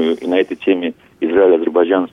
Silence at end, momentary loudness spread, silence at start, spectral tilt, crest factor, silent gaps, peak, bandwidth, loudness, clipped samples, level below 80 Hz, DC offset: 0.05 s; 8 LU; 0 s; -6.5 dB/octave; 12 dB; none; -2 dBFS; 6.2 kHz; -15 LUFS; under 0.1%; -60 dBFS; under 0.1%